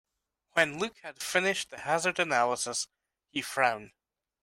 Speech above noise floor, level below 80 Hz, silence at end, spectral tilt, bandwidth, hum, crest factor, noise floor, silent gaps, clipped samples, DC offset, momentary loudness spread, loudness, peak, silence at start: 47 dB; -72 dBFS; 0.55 s; -2 dB/octave; 16 kHz; none; 22 dB; -77 dBFS; none; under 0.1%; under 0.1%; 10 LU; -30 LUFS; -8 dBFS; 0.55 s